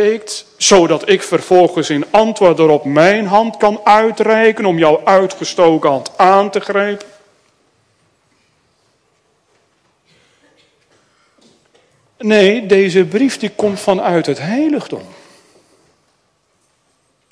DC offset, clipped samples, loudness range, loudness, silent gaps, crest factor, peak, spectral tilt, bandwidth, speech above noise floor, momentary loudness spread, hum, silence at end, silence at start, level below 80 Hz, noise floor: under 0.1%; under 0.1%; 9 LU; -12 LUFS; none; 14 dB; 0 dBFS; -4.5 dB/octave; 11 kHz; 49 dB; 7 LU; none; 2.25 s; 0 s; -54 dBFS; -61 dBFS